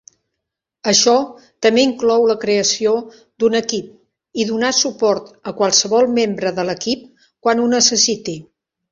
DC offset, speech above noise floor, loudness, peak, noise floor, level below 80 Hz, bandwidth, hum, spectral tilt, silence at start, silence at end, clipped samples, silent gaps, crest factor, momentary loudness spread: under 0.1%; 63 dB; -16 LUFS; 0 dBFS; -80 dBFS; -60 dBFS; 7.6 kHz; none; -2.5 dB/octave; 0.85 s; 0.5 s; under 0.1%; none; 18 dB; 12 LU